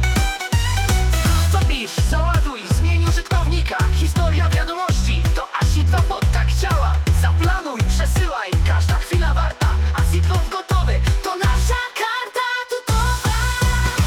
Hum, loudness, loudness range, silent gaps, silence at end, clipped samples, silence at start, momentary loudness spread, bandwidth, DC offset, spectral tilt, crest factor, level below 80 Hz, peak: none; -19 LUFS; 1 LU; none; 0 s; under 0.1%; 0 s; 4 LU; 17.5 kHz; under 0.1%; -5 dB/octave; 12 dB; -20 dBFS; -6 dBFS